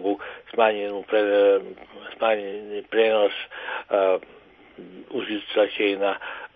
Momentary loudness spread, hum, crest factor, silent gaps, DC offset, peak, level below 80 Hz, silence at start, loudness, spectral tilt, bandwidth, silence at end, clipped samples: 14 LU; none; 18 dB; none; under 0.1%; -6 dBFS; -68 dBFS; 0 s; -23 LUFS; -7.5 dB/octave; 4.8 kHz; 0.1 s; under 0.1%